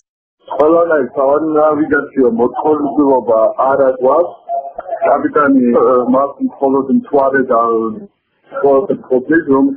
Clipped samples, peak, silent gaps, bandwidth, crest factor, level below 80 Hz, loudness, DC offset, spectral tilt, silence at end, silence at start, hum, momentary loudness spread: under 0.1%; 0 dBFS; none; 3.5 kHz; 12 dB; -52 dBFS; -13 LUFS; under 0.1%; -6.5 dB/octave; 0 s; 0.5 s; none; 7 LU